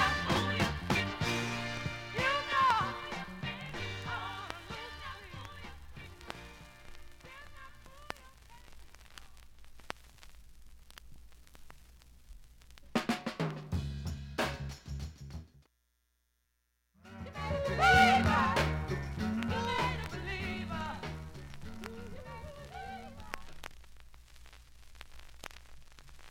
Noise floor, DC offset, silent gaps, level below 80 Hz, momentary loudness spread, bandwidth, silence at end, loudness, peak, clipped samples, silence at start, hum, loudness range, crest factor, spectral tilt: -79 dBFS; under 0.1%; none; -50 dBFS; 25 LU; 17 kHz; 0 s; -33 LUFS; -10 dBFS; under 0.1%; 0 s; none; 22 LU; 26 dB; -4.5 dB/octave